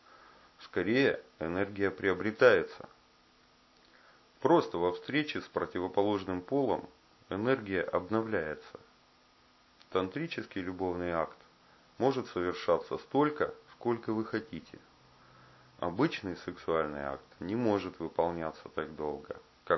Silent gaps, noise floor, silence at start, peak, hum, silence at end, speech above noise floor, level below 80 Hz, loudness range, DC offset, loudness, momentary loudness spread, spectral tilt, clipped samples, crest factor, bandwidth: none; -64 dBFS; 0.6 s; -8 dBFS; none; 0 s; 32 dB; -62 dBFS; 6 LU; under 0.1%; -33 LUFS; 12 LU; -4.5 dB/octave; under 0.1%; 26 dB; 6 kHz